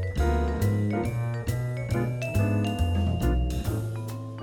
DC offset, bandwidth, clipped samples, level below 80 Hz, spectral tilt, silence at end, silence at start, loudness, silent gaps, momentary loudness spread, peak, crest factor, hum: under 0.1%; 18 kHz; under 0.1%; -32 dBFS; -7 dB/octave; 0 s; 0 s; -28 LUFS; none; 5 LU; -12 dBFS; 14 dB; none